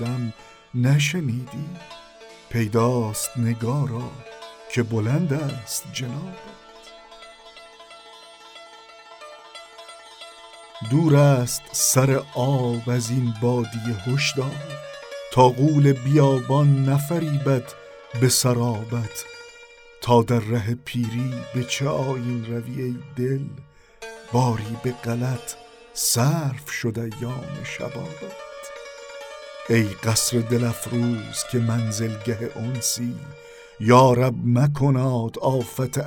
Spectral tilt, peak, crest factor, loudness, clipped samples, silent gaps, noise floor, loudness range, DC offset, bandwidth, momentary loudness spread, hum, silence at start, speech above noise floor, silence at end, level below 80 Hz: -5.5 dB/octave; 0 dBFS; 22 dB; -22 LUFS; under 0.1%; none; -47 dBFS; 10 LU; under 0.1%; 19 kHz; 23 LU; none; 0 s; 25 dB; 0 s; -56 dBFS